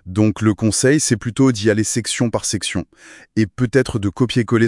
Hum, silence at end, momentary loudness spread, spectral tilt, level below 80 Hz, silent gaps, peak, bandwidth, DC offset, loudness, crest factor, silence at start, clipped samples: none; 0 s; 7 LU; -5 dB/octave; -48 dBFS; none; -2 dBFS; 12 kHz; under 0.1%; -18 LUFS; 16 dB; 0.05 s; under 0.1%